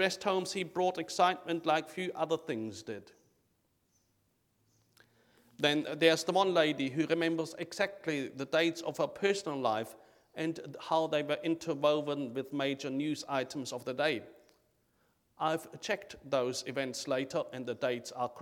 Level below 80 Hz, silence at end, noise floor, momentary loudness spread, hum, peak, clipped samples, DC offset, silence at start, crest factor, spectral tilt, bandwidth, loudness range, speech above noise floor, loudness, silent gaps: -78 dBFS; 0 s; -76 dBFS; 10 LU; none; -12 dBFS; under 0.1%; under 0.1%; 0 s; 22 dB; -4 dB/octave; 17.5 kHz; 7 LU; 43 dB; -33 LUFS; none